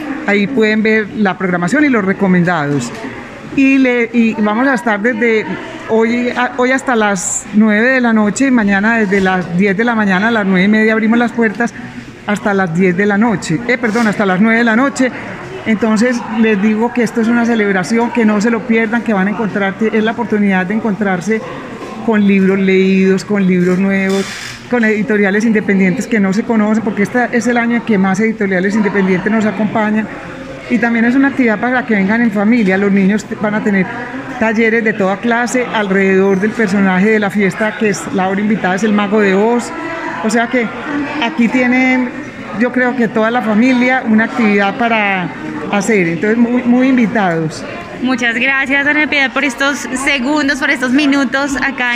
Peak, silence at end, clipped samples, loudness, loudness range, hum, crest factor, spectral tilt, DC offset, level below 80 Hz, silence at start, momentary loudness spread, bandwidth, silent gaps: -2 dBFS; 0 s; under 0.1%; -13 LUFS; 2 LU; none; 10 dB; -5.5 dB/octave; 0.1%; -48 dBFS; 0 s; 7 LU; 11.5 kHz; none